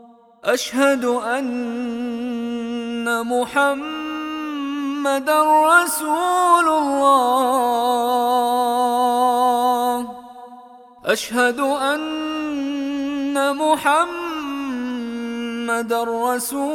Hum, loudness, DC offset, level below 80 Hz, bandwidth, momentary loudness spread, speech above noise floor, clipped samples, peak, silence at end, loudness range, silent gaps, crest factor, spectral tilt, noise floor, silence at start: none; -19 LUFS; under 0.1%; -62 dBFS; 18.5 kHz; 11 LU; 25 dB; under 0.1%; -2 dBFS; 0 s; 6 LU; none; 18 dB; -2.5 dB/octave; -43 dBFS; 0.05 s